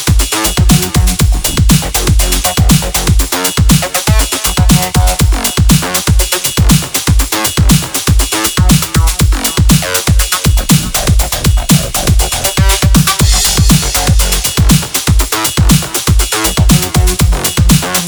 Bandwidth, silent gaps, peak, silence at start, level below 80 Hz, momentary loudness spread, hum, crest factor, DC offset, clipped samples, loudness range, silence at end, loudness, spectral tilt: over 20 kHz; none; 0 dBFS; 0 s; -14 dBFS; 3 LU; none; 10 dB; under 0.1%; 0.4%; 1 LU; 0 s; -10 LUFS; -4 dB/octave